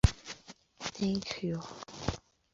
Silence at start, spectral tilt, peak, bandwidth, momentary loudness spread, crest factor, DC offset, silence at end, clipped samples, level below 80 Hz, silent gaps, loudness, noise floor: 0.05 s; -5.5 dB/octave; -8 dBFS; 7.6 kHz; 15 LU; 26 dB; under 0.1%; 0.35 s; under 0.1%; -42 dBFS; none; -37 LUFS; -54 dBFS